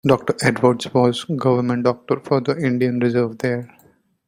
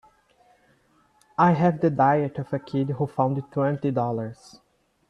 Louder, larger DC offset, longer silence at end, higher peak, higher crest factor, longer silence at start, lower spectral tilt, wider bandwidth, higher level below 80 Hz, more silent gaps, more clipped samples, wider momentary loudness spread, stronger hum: first, -19 LUFS vs -24 LUFS; neither; second, 0.6 s vs 0.75 s; first, -2 dBFS vs -6 dBFS; about the same, 18 dB vs 20 dB; second, 0.05 s vs 1.4 s; second, -6.5 dB/octave vs -9 dB/octave; first, 15.5 kHz vs 9 kHz; first, -56 dBFS vs -64 dBFS; neither; neither; second, 6 LU vs 11 LU; neither